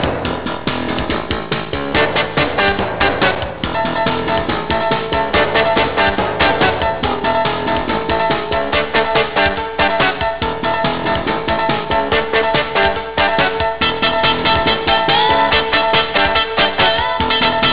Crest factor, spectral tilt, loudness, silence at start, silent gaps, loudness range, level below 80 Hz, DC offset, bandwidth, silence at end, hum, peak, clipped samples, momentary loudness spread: 10 dB; -8 dB/octave; -15 LUFS; 0 s; none; 3 LU; -34 dBFS; 2%; 4 kHz; 0 s; none; -6 dBFS; under 0.1%; 6 LU